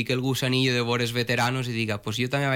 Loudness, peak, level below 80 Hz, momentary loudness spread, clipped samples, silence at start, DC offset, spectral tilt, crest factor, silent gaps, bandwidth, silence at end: -25 LUFS; -14 dBFS; -56 dBFS; 5 LU; under 0.1%; 0 s; under 0.1%; -5 dB/octave; 12 dB; none; 17 kHz; 0 s